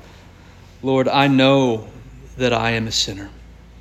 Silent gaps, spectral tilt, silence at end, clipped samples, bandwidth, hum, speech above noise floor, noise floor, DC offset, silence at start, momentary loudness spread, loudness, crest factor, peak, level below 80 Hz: none; -5 dB/octave; 0.3 s; under 0.1%; 13.5 kHz; none; 26 dB; -44 dBFS; under 0.1%; 0.85 s; 17 LU; -18 LUFS; 18 dB; -2 dBFS; -44 dBFS